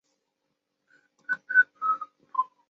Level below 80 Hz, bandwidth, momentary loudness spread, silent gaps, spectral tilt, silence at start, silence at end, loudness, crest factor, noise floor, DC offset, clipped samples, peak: under -90 dBFS; 6.2 kHz; 11 LU; none; 1.5 dB/octave; 1.3 s; 0.25 s; -26 LUFS; 22 dB; -80 dBFS; under 0.1%; under 0.1%; -8 dBFS